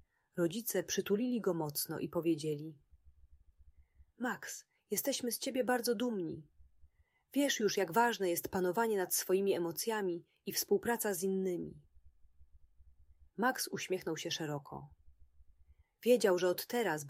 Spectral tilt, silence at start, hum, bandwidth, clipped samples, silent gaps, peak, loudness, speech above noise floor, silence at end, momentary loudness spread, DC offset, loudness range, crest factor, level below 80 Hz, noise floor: -4 dB/octave; 0.35 s; none; 16 kHz; under 0.1%; none; -16 dBFS; -35 LUFS; 31 dB; 0 s; 12 LU; under 0.1%; 6 LU; 20 dB; -70 dBFS; -66 dBFS